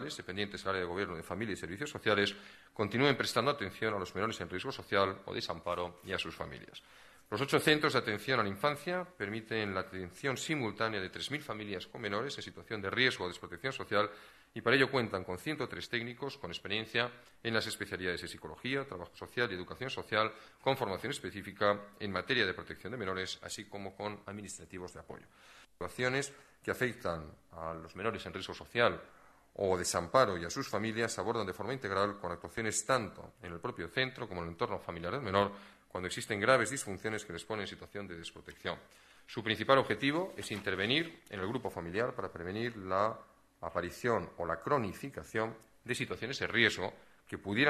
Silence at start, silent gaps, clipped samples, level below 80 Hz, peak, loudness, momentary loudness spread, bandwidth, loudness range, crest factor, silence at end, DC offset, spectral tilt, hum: 0 s; none; under 0.1%; -66 dBFS; -10 dBFS; -35 LUFS; 15 LU; 14 kHz; 4 LU; 26 dB; 0 s; under 0.1%; -4 dB/octave; none